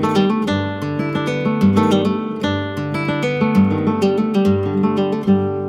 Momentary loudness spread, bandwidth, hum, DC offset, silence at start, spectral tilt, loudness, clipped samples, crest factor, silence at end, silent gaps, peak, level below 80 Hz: 6 LU; 12 kHz; none; under 0.1%; 0 s; -7.5 dB/octave; -18 LUFS; under 0.1%; 14 dB; 0 s; none; -4 dBFS; -52 dBFS